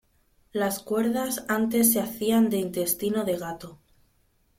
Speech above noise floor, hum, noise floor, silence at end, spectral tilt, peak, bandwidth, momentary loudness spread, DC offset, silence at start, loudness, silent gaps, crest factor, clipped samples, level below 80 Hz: 41 dB; none; -66 dBFS; 0.85 s; -4 dB/octave; -6 dBFS; 16.5 kHz; 13 LU; under 0.1%; 0.55 s; -25 LUFS; none; 20 dB; under 0.1%; -62 dBFS